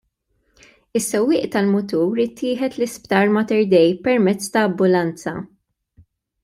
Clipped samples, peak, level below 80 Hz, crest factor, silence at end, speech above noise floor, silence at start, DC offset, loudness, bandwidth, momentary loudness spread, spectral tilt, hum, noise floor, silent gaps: under 0.1%; -2 dBFS; -60 dBFS; 18 dB; 1 s; 49 dB; 0.95 s; under 0.1%; -19 LUFS; 16 kHz; 10 LU; -5.5 dB/octave; none; -67 dBFS; none